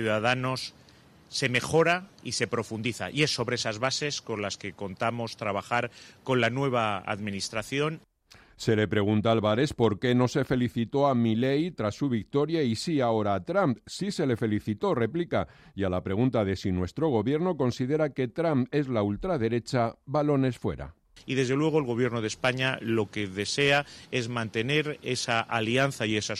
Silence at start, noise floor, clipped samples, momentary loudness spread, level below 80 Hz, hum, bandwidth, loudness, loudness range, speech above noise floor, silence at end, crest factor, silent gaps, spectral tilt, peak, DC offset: 0 s; -57 dBFS; under 0.1%; 8 LU; -58 dBFS; none; 14 kHz; -28 LUFS; 3 LU; 30 dB; 0 s; 18 dB; none; -5.5 dB/octave; -10 dBFS; under 0.1%